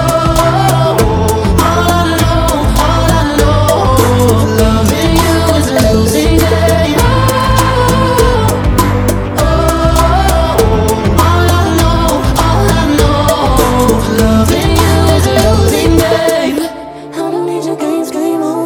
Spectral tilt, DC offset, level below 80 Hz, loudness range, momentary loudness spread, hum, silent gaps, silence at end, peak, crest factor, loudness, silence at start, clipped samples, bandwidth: -5.5 dB/octave; under 0.1%; -18 dBFS; 1 LU; 5 LU; none; none; 0 s; 0 dBFS; 10 dB; -10 LUFS; 0 s; 0.6%; over 20 kHz